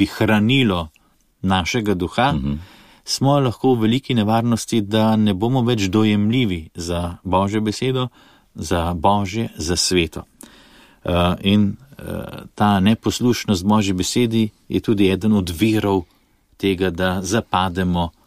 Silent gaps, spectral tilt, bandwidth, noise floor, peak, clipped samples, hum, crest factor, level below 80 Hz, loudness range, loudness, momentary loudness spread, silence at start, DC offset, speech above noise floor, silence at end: none; -5.5 dB/octave; 15.5 kHz; -57 dBFS; -2 dBFS; under 0.1%; none; 16 dB; -42 dBFS; 3 LU; -19 LUFS; 9 LU; 0 s; 0.3%; 39 dB; 0.2 s